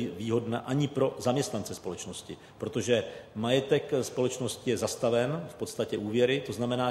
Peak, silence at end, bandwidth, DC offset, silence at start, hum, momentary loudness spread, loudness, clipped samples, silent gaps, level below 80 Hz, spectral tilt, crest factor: -12 dBFS; 0 s; 14.5 kHz; under 0.1%; 0 s; none; 11 LU; -30 LUFS; under 0.1%; none; -64 dBFS; -5 dB/octave; 18 dB